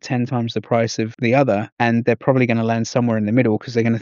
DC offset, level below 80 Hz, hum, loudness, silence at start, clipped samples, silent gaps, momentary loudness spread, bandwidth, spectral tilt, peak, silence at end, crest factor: under 0.1%; -62 dBFS; none; -19 LUFS; 0.05 s; under 0.1%; 1.72-1.77 s; 5 LU; 7.4 kHz; -6 dB/octave; -2 dBFS; 0 s; 16 dB